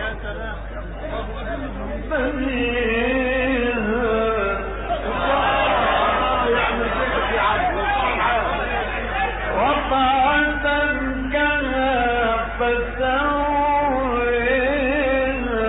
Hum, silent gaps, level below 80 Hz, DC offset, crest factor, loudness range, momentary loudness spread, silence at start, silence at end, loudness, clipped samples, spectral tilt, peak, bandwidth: none; none; -32 dBFS; under 0.1%; 14 dB; 2 LU; 10 LU; 0 s; 0 s; -20 LUFS; under 0.1%; -10 dB/octave; -6 dBFS; 4 kHz